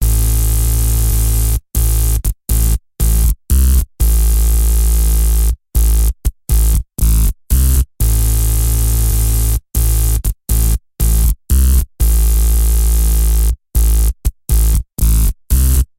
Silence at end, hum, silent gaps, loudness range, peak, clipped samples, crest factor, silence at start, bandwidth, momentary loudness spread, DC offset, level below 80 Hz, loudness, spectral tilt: 0.15 s; none; none; 1 LU; 0 dBFS; under 0.1%; 12 dB; 0 s; 17 kHz; 4 LU; 0.3%; -12 dBFS; -15 LUFS; -4.5 dB/octave